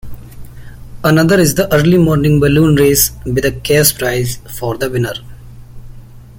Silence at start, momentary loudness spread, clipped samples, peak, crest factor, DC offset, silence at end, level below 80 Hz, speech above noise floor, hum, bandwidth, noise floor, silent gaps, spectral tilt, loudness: 0.05 s; 11 LU; under 0.1%; 0 dBFS; 14 dB; under 0.1%; 0.05 s; -32 dBFS; 22 dB; none; 17 kHz; -33 dBFS; none; -5 dB/octave; -12 LUFS